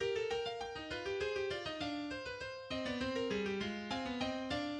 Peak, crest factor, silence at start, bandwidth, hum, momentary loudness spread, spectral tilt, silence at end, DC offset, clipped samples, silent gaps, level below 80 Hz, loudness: -26 dBFS; 14 dB; 0 s; 10.5 kHz; none; 5 LU; -4.5 dB/octave; 0 s; under 0.1%; under 0.1%; none; -62 dBFS; -40 LUFS